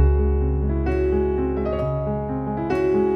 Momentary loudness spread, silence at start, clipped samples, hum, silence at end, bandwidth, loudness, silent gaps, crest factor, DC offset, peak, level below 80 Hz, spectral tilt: 5 LU; 0 s; under 0.1%; none; 0 s; 5.4 kHz; -23 LUFS; none; 14 dB; under 0.1%; -6 dBFS; -24 dBFS; -10.5 dB/octave